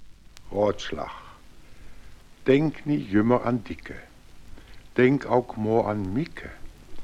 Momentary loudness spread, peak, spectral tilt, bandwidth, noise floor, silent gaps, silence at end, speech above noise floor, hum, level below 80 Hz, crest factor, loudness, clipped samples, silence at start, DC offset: 17 LU; -6 dBFS; -7.5 dB/octave; 12 kHz; -46 dBFS; none; 0 s; 21 dB; none; -48 dBFS; 20 dB; -25 LUFS; under 0.1%; 0 s; under 0.1%